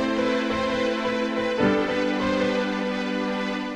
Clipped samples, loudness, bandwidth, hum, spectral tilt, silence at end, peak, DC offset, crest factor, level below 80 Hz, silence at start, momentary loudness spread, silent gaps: under 0.1%; -24 LUFS; 11 kHz; none; -5.5 dB/octave; 0 s; -10 dBFS; under 0.1%; 14 dB; -50 dBFS; 0 s; 4 LU; none